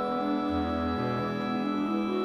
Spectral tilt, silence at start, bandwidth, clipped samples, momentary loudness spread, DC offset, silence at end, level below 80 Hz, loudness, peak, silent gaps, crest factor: -7.5 dB/octave; 0 s; 12.5 kHz; under 0.1%; 1 LU; under 0.1%; 0 s; -50 dBFS; -30 LUFS; -18 dBFS; none; 12 dB